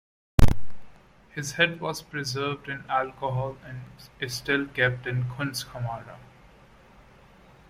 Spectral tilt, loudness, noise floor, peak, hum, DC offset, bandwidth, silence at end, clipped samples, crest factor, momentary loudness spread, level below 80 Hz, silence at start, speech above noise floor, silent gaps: -5 dB/octave; -28 LUFS; -54 dBFS; -4 dBFS; none; under 0.1%; 16 kHz; 1.55 s; under 0.1%; 22 dB; 16 LU; -34 dBFS; 0.4 s; 24 dB; none